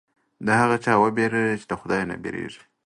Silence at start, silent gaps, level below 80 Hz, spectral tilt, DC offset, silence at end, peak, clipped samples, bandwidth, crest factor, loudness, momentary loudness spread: 0.4 s; none; -58 dBFS; -6 dB/octave; under 0.1%; 0.3 s; -6 dBFS; under 0.1%; 11.5 kHz; 18 dB; -23 LUFS; 12 LU